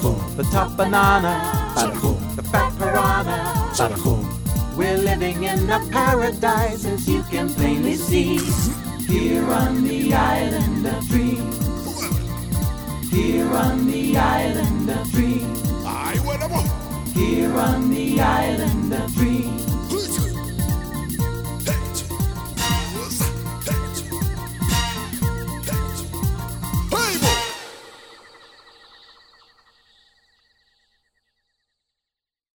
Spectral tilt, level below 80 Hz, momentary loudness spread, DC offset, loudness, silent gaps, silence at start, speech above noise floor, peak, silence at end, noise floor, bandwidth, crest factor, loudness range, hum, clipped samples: -5 dB/octave; -32 dBFS; 7 LU; under 0.1%; -21 LUFS; none; 0 s; 69 dB; -2 dBFS; 4.45 s; -88 dBFS; over 20 kHz; 18 dB; 4 LU; none; under 0.1%